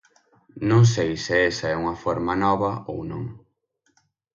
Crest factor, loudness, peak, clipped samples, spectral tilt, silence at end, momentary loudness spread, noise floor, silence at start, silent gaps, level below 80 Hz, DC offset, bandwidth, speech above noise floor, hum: 18 dB; -23 LUFS; -6 dBFS; under 0.1%; -6 dB/octave; 0.95 s; 14 LU; -70 dBFS; 0.55 s; none; -50 dBFS; under 0.1%; 7.4 kHz; 48 dB; none